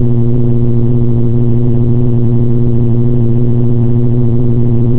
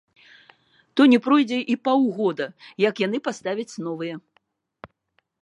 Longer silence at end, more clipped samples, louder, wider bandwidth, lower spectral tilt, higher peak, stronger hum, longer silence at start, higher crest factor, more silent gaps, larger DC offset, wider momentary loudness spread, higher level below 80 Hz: second, 0 s vs 0.55 s; neither; first, -12 LUFS vs -22 LUFS; second, 2 kHz vs 10 kHz; first, -14.5 dB/octave vs -5.5 dB/octave; first, 0 dBFS vs -4 dBFS; neither; second, 0 s vs 0.95 s; second, 6 dB vs 18 dB; neither; neither; second, 1 LU vs 15 LU; first, -20 dBFS vs -74 dBFS